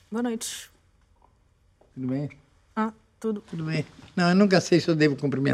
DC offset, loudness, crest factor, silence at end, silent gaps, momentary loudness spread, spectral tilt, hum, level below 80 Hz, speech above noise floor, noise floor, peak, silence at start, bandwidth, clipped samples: under 0.1%; -25 LUFS; 22 dB; 0 s; none; 14 LU; -6 dB/octave; none; -64 dBFS; 39 dB; -63 dBFS; -4 dBFS; 0.1 s; 15 kHz; under 0.1%